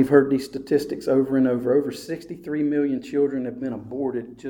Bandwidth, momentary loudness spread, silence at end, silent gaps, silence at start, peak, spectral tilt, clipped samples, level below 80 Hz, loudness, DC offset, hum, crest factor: 17.5 kHz; 11 LU; 0 s; none; 0 s; -4 dBFS; -7 dB/octave; under 0.1%; -60 dBFS; -24 LUFS; under 0.1%; none; 18 dB